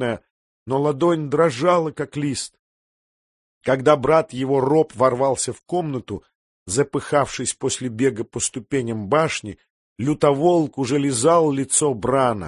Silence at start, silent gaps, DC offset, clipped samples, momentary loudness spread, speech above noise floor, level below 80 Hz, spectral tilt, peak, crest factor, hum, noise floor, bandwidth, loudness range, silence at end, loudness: 0 s; 0.30-0.66 s, 2.59-3.61 s, 6.35-6.66 s, 9.70-9.96 s; under 0.1%; under 0.1%; 10 LU; over 70 dB; -52 dBFS; -5 dB/octave; -2 dBFS; 20 dB; none; under -90 dBFS; 11.5 kHz; 4 LU; 0 s; -20 LUFS